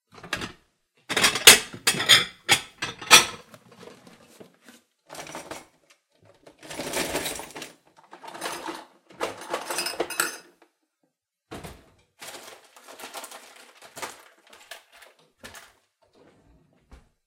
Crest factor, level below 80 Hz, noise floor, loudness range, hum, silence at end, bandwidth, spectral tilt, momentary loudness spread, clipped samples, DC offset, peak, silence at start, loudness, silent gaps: 28 dB; -60 dBFS; -76 dBFS; 26 LU; none; 1.7 s; 16.5 kHz; 0 dB/octave; 29 LU; under 0.1%; under 0.1%; 0 dBFS; 0.25 s; -20 LUFS; none